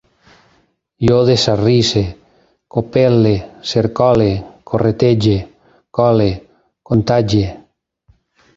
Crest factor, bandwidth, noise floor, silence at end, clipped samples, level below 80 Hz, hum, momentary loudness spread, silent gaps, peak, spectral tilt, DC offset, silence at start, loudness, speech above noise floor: 14 dB; 7.8 kHz; -58 dBFS; 1 s; under 0.1%; -38 dBFS; none; 10 LU; none; 0 dBFS; -6.5 dB/octave; under 0.1%; 1 s; -15 LUFS; 45 dB